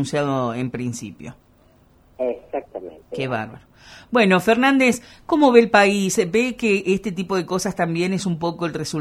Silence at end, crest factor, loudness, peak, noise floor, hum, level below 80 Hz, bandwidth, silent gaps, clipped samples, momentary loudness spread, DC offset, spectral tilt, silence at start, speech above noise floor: 0 s; 20 dB; -20 LUFS; 0 dBFS; -54 dBFS; none; -54 dBFS; 15 kHz; none; under 0.1%; 16 LU; under 0.1%; -5 dB/octave; 0 s; 34 dB